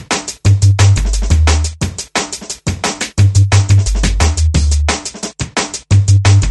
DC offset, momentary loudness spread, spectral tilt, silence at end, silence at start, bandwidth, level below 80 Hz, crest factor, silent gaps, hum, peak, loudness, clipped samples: under 0.1%; 9 LU; -4.5 dB/octave; 0 s; 0 s; 11.5 kHz; -18 dBFS; 12 dB; none; none; 0 dBFS; -13 LUFS; under 0.1%